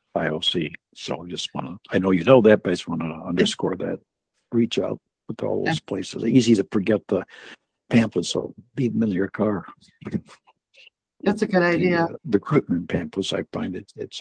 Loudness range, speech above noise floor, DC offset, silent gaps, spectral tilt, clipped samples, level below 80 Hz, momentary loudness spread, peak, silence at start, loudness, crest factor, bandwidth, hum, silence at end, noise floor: 4 LU; 32 dB; under 0.1%; none; -6 dB/octave; under 0.1%; -60 dBFS; 14 LU; -2 dBFS; 0.15 s; -23 LUFS; 22 dB; 9.8 kHz; none; 0 s; -55 dBFS